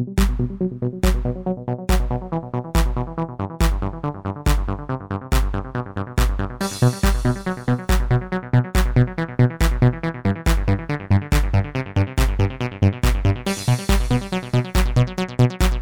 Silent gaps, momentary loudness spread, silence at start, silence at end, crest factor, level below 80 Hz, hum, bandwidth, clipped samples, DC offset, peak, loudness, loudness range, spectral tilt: none; 7 LU; 0 s; 0 s; 14 dB; -24 dBFS; none; 20 kHz; under 0.1%; 0.3%; -6 dBFS; -22 LUFS; 4 LU; -6 dB/octave